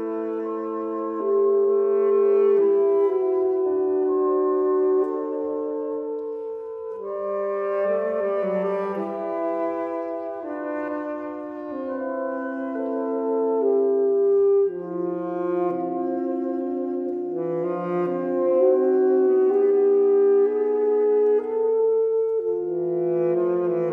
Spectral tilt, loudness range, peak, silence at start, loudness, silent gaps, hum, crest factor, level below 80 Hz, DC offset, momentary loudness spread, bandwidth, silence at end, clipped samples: -10 dB/octave; 8 LU; -10 dBFS; 0 s; -23 LUFS; none; none; 14 dB; -70 dBFS; under 0.1%; 10 LU; 3.1 kHz; 0 s; under 0.1%